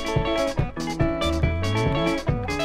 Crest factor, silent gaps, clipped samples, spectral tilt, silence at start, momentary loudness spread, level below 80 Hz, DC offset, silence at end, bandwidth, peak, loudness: 14 dB; none; under 0.1%; -6 dB/octave; 0 s; 3 LU; -32 dBFS; under 0.1%; 0 s; 15.5 kHz; -8 dBFS; -24 LUFS